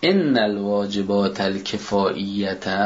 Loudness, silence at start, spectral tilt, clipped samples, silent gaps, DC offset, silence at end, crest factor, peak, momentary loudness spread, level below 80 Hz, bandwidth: -22 LUFS; 0 s; -5.5 dB/octave; under 0.1%; none; under 0.1%; 0 s; 16 dB; -4 dBFS; 6 LU; -56 dBFS; 7.8 kHz